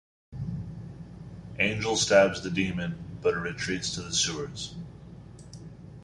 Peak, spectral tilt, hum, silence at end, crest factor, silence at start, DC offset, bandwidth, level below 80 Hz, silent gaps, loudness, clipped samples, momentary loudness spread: -6 dBFS; -3.5 dB/octave; none; 0 s; 24 dB; 0.3 s; under 0.1%; 11.5 kHz; -52 dBFS; none; -28 LUFS; under 0.1%; 24 LU